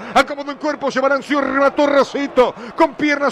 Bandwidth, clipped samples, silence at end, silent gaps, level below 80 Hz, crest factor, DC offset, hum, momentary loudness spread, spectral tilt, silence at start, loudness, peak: 13 kHz; under 0.1%; 0 s; none; -50 dBFS; 12 dB; under 0.1%; none; 6 LU; -4 dB/octave; 0 s; -17 LUFS; -4 dBFS